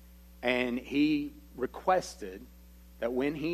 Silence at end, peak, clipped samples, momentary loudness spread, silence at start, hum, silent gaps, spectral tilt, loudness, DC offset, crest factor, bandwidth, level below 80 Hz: 0 s; -14 dBFS; under 0.1%; 14 LU; 0 s; none; none; -5 dB/octave; -32 LUFS; under 0.1%; 20 dB; 13.5 kHz; -54 dBFS